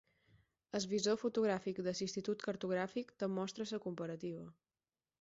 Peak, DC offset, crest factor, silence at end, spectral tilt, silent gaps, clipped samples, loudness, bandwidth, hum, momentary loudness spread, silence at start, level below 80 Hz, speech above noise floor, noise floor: -24 dBFS; under 0.1%; 18 dB; 0.7 s; -4.5 dB/octave; none; under 0.1%; -40 LUFS; 8 kHz; none; 9 LU; 0.75 s; -78 dBFS; over 51 dB; under -90 dBFS